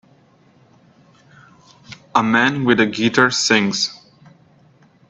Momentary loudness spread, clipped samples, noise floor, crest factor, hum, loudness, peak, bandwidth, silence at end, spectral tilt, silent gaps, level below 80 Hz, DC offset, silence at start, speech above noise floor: 6 LU; under 0.1%; -53 dBFS; 20 dB; none; -16 LUFS; 0 dBFS; 8.4 kHz; 1.15 s; -3.5 dB/octave; none; -60 dBFS; under 0.1%; 1.9 s; 37 dB